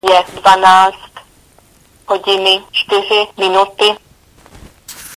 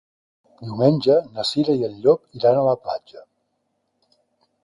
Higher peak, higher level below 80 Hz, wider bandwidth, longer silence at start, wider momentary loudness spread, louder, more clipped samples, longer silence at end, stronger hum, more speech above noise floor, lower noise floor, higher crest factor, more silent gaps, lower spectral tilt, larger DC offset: first, 0 dBFS vs -4 dBFS; first, -50 dBFS vs -62 dBFS; first, 16 kHz vs 11.5 kHz; second, 0.05 s vs 0.6 s; about the same, 12 LU vs 13 LU; first, -11 LUFS vs -20 LUFS; neither; second, 0.05 s vs 1.45 s; neither; second, 36 dB vs 53 dB; second, -48 dBFS vs -72 dBFS; about the same, 14 dB vs 18 dB; neither; second, -2 dB/octave vs -7 dB/octave; neither